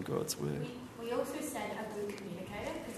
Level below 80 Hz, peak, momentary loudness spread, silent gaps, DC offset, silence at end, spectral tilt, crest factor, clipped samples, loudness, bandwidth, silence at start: -64 dBFS; -20 dBFS; 7 LU; none; under 0.1%; 0 s; -4.5 dB/octave; 20 dB; under 0.1%; -39 LUFS; 13.5 kHz; 0 s